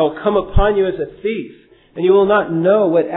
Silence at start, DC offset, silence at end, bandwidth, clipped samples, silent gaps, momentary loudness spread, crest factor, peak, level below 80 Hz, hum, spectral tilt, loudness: 0 s; under 0.1%; 0 s; 4 kHz; under 0.1%; none; 12 LU; 14 dB; -2 dBFS; -26 dBFS; none; -11 dB/octave; -16 LUFS